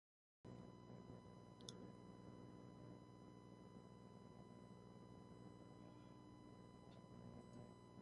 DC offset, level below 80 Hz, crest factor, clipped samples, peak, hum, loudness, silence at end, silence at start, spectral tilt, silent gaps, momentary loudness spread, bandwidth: under 0.1%; -78 dBFS; 28 dB; under 0.1%; -34 dBFS; 60 Hz at -65 dBFS; -62 LUFS; 0 s; 0.45 s; -6 dB/octave; none; 3 LU; 11 kHz